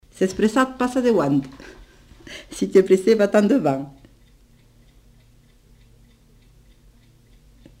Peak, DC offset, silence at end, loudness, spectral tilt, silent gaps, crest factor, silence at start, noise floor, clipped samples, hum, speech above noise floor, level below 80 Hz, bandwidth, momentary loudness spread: -4 dBFS; under 0.1%; 3.9 s; -19 LUFS; -6 dB/octave; none; 20 dB; 0.2 s; -53 dBFS; under 0.1%; none; 34 dB; -52 dBFS; 15.5 kHz; 22 LU